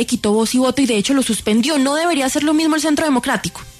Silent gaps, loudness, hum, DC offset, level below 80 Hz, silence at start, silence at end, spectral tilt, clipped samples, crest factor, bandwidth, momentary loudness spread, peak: none; -16 LUFS; none; under 0.1%; -48 dBFS; 0 s; 0.1 s; -3.5 dB/octave; under 0.1%; 10 dB; 13.5 kHz; 2 LU; -6 dBFS